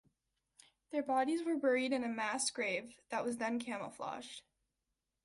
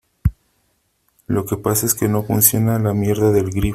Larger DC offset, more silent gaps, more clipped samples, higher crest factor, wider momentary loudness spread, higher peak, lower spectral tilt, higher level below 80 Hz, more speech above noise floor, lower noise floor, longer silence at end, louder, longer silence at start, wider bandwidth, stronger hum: neither; neither; neither; about the same, 18 dB vs 18 dB; about the same, 11 LU vs 10 LU; second, -22 dBFS vs 0 dBFS; second, -2.5 dB/octave vs -5.5 dB/octave; second, -80 dBFS vs -36 dBFS; about the same, 51 dB vs 48 dB; first, -88 dBFS vs -65 dBFS; first, 0.85 s vs 0 s; second, -37 LUFS vs -17 LUFS; first, 0.9 s vs 0.25 s; second, 11.5 kHz vs 16 kHz; neither